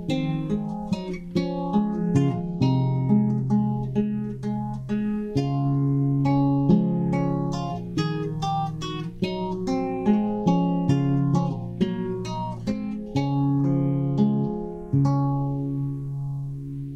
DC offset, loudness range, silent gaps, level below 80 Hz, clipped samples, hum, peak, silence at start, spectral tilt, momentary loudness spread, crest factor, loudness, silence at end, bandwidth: under 0.1%; 2 LU; none; -46 dBFS; under 0.1%; none; -8 dBFS; 0 s; -8.5 dB/octave; 8 LU; 16 dB; -25 LUFS; 0 s; 7.8 kHz